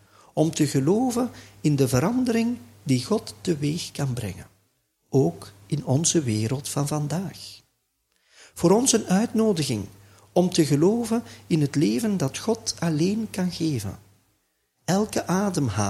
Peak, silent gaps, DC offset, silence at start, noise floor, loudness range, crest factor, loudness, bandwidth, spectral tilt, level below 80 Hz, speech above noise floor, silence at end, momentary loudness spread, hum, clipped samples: -4 dBFS; none; under 0.1%; 0.35 s; -72 dBFS; 4 LU; 20 dB; -24 LUFS; 15.5 kHz; -5.5 dB/octave; -56 dBFS; 49 dB; 0 s; 10 LU; none; under 0.1%